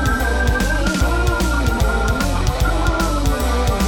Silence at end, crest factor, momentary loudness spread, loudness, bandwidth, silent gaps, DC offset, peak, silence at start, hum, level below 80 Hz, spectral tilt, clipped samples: 0 s; 12 dB; 1 LU; -18 LUFS; 18 kHz; none; under 0.1%; -4 dBFS; 0 s; none; -20 dBFS; -5 dB/octave; under 0.1%